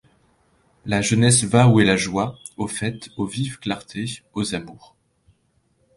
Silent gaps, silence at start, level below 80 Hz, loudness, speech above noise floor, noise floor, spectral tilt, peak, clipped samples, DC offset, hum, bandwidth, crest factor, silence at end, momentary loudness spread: none; 0.85 s; -50 dBFS; -21 LUFS; 45 dB; -65 dBFS; -4.5 dB/octave; -2 dBFS; under 0.1%; under 0.1%; none; 11.5 kHz; 20 dB; 1.25 s; 15 LU